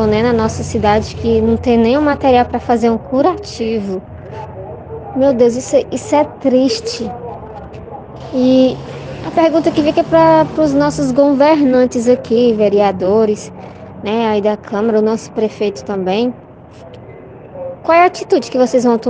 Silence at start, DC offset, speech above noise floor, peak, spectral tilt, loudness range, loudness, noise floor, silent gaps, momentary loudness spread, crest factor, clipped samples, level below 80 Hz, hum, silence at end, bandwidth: 0 s; under 0.1%; 23 dB; 0 dBFS; -6 dB/octave; 5 LU; -13 LUFS; -36 dBFS; none; 18 LU; 14 dB; under 0.1%; -40 dBFS; none; 0 s; 9.6 kHz